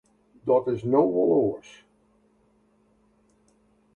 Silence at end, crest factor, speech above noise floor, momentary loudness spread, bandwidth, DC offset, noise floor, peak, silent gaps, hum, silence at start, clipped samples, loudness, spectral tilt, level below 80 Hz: 2.35 s; 20 dB; 41 dB; 11 LU; 8.2 kHz; under 0.1%; -64 dBFS; -8 dBFS; none; none; 0.45 s; under 0.1%; -24 LUFS; -9 dB/octave; -64 dBFS